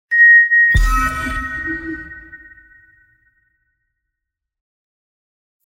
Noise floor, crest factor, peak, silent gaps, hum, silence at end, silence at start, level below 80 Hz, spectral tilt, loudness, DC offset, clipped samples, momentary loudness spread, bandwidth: -81 dBFS; 16 dB; -2 dBFS; none; none; 3.3 s; 0.1 s; -28 dBFS; -4.5 dB/octave; -12 LUFS; under 0.1%; under 0.1%; 22 LU; 16.5 kHz